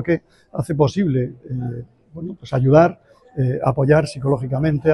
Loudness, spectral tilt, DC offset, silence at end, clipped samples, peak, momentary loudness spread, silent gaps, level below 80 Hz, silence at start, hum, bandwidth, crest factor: -19 LUFS; -8.5 dB/octave; under 0.1%; 0 s; under 0.1%; -2 dBFS; 18 LU; none; -46 dBFS; 0 s; none; 11.5 kHz; 18 dB